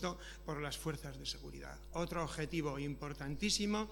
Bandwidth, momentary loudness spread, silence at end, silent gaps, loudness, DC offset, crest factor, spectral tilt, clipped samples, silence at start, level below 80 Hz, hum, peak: 19 kHz; 12 LU; 0 s; none; -41 LUFS; under 0.1%; 18 dB; -4 dB/octave; under 0.1%; 0 s; -52 dBFS; none; -22 dBFS